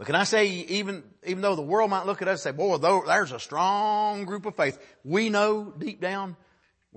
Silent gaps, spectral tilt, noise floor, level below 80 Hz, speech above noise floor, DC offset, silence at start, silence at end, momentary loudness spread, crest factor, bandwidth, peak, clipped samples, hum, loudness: none; -4 dB/octave; -58 dBFS; -74 dBFS; 33 dB; under 0.1%; 0 s; 0.6 s; 11 LU; 18 dB; 8.8 kHz; -8 dBFS; under 0.1%; none; -26 LUFS